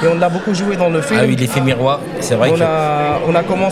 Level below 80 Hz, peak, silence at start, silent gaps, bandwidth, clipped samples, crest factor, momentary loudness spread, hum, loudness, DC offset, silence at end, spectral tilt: -46 dBFS; 0 dBFS; 0 s; none; 15.5 kHz; under 0.1%; 14 dB; 4 LU; none; -15 LUFS; under 0.1%; 0 s; -6 dB/octave